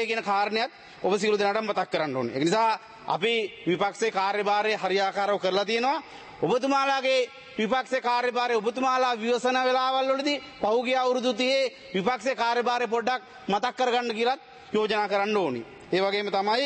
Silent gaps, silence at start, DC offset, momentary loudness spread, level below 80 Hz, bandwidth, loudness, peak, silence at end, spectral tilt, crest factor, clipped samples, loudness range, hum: none; 0 s; under 0.1%; 6 LU; -70 dBFS; 8.8 kHz; -26 LUFS; -12 dBFS; 0 s; -4 dB/octave; 14 dB; under 0.1%; 2 LU; none